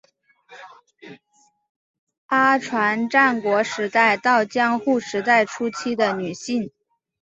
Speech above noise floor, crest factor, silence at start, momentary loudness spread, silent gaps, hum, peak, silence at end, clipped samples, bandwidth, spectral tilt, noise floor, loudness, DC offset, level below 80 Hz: 42 dB; 20 dB; 0.5 s; 9 LU; 1.69-2.07 s, 2.18-2.29 s; none; -2 dBFS; 0.55 s; under 0.1%; 8 kHz; -4 dB/octave; -62 dBFS; -20 LUFS; under 0.1%; -68 dBFS